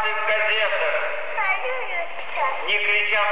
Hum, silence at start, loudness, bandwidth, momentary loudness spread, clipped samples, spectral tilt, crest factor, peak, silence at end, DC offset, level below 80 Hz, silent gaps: none; 0 s; -21 LUFS; 4 kHz; 8 LU; under 0.1%; -4 dB/octave; 14 dB; -10 dBFS; 0 s; 4%; -70 dBFS; none